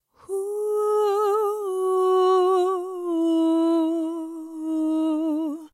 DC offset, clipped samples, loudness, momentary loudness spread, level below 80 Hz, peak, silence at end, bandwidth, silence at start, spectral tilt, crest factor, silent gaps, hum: under 0.1%; under 0.1%; -23 LUFS; 10 LU; -80 dBFS; -12 dBFS; 0.05 s; 14 kHz; 0.3 s; -4 dB/octave; 12 dB; none; none